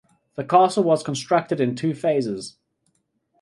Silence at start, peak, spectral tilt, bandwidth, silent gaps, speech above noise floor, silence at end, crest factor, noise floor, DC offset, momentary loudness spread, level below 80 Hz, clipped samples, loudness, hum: 0.4 s; -4 dBFS; -6 dB/octave; 11.5 kHz; none; 49 dB; 0.9 s; 18 dB; -70 dBFS; under 0.1%; 16 LU; -66 dBFS; under 0.1%; -21 LUFS; none